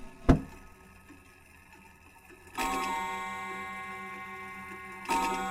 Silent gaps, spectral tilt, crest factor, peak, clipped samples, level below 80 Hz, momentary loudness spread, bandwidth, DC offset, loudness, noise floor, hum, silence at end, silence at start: none; -5 dB/octave; 28 dB; -6 dBFS; under 0.1%; -42 dBFS; 26 LU; 16.5 kHz; under 0.1%; -33 LUFS; -56 dBFS; none; 0 s; 0 s